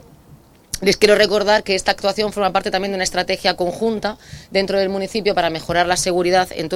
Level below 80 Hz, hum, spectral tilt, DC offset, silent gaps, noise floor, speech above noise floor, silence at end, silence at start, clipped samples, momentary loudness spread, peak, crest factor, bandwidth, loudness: -44 dBFS; none; -3.5 dB/octave; under 0.1%; none; -47 dBFS; 29 dB; 0 s; 0.3 s; under 0.1%; 7 LU; 0 dBFS; 18 dB; 16.5 kHz; -18 LUFS